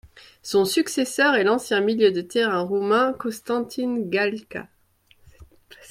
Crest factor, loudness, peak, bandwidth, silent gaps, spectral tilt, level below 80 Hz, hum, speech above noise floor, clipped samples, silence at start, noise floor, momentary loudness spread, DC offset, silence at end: 18 dB; -22 LUFS; -6 dBFS; 16 kHz; none; -4 dB/octave; -60 dBFS; none; 37 dB; under 0.1%; 0.05 s; -59 dBFS; 10 LU; under 0.1%; 0.05 s